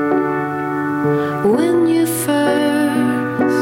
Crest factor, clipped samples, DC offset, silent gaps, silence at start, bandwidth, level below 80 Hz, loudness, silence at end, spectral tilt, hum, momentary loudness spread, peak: 10 dB; under 0.1%; under 0.1%; none; 0 s; 16.5 kHz; -56 dBFS; -16 LUFS; 0 s; -5.5 dB/octave; none; 5 LU; -6 dBFS